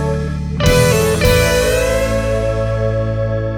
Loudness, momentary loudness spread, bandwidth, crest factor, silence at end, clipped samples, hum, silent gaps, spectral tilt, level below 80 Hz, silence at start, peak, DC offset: -15 LUFS; 7 LU; over 20 kHz; 14 dB; 0 s; under 0.1%; none; none; -5 dB/octave; -24 dBFS; 0 s; 0 dBFS; under 0.1%